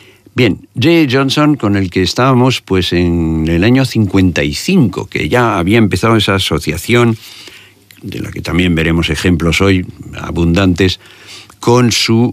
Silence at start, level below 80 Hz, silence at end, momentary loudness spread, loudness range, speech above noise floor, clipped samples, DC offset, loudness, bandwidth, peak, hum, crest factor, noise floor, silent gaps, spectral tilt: 0.35 s; -32 dBFS; 0 s; 13 LU; 3 LU; 29 dB; under 0.1%; under 0.1%; -12 LUFS; 15.5 kHz; 0 dBFS; none; 12 dB; -40 dBFS; none; -5.5 dB/octave